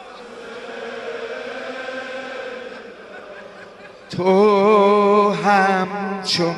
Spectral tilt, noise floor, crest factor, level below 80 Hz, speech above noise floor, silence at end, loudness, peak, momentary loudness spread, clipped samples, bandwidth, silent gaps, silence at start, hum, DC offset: -5.5 dB/octave; -40 dBFS; 18 dB; -64 dBFS; 25 dB; 0 s; -18 LUFS; -2 dBFS; 23 LU; under 0.1%; 11.5 kHz; none; 0 s; none; under 0.1%